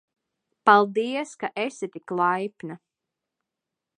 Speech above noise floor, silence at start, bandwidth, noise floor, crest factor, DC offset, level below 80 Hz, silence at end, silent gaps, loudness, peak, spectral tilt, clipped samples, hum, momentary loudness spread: 62 dB; 0.65 s; 10 kHz; -86 dBFS; 22 dB; under 0.1%; -82 dBFS; 1.2 s; none; -24 LUFS; -4 dBFS; -5 dB/octave; under 0.1%; none; 17 LU